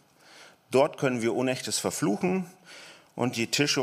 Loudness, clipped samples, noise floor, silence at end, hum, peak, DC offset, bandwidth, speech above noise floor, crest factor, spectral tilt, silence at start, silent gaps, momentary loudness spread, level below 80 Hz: -27 LUFS; under 0.1%; -53 dBFS; 0 s; none; -8 dBFS; under 0.1%; 15.5 kHz; 27 dB; 20 dB; -4 dB/octave; 0.35 s; none; 18 LU; -72 dBFS